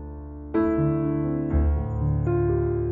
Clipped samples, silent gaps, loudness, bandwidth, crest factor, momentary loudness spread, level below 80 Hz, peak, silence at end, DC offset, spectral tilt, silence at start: under 0.1%; none; -24 LUFS; 3.1 kHz; 12 dB; 5 LU; -32 dBFS; -12 dBFS; 0 s; under 0.1%; -12.5 dB/octave; 0 s